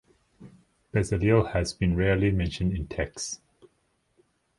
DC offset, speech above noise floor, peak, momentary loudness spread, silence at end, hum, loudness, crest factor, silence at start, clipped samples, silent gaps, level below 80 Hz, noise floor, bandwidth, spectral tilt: under 0.1%; 46 dB; -8 dBFS; 10 LU; 1.25 s; none; -27 LUFS; 20 dB; 0.4 s; under 0.1%; none; -40 dBFS; -71 dBFS; 11.5 kHz; -6 dB/octave